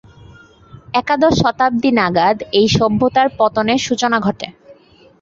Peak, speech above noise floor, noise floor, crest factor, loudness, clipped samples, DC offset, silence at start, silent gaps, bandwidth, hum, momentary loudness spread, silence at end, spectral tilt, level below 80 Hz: -2 dBFS; 32 dB; -46 dBFS; 14 dB; -15 LUFS; under 0.1%; under 0.1%; 0.75 s; none; 7.8 kHz; none; 7 LU; 0.5 s; -5 dB/octave; -44 dBFS